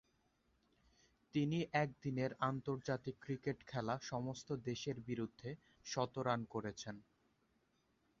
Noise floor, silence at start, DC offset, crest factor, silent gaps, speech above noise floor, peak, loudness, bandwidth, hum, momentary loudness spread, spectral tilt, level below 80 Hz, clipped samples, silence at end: -79 dBFS; 1.35 s; under 0.1%; 22 dB; none; 38 dB; -22 dBFS; -42 LUFS; 7.4 kHz; none; 9 LU; -5.5 dB/octave; -74 dBFS; under 0.1%; 1.2 s